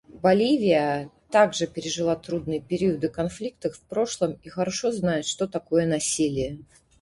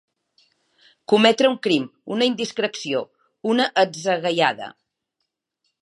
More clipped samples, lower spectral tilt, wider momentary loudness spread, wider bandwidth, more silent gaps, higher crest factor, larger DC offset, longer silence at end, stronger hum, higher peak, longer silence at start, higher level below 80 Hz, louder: neither; about the same, -4.5 dB/octave vs -4 dB/octave; second, 10 LU vs 14 LU; about the same, 11.5 kHz vs 11.5 kHz; neither; about the same, 20 dB vs 20 dB; neither; second, 0.4 s vs 1.1 s; neither; second, -6 dBFS vs -2 dBFS; second, 0.15 s vs 1.1 s; first, -54 dBFS vs -78 dBFS; second, -25 LUFS vs -21 LUFS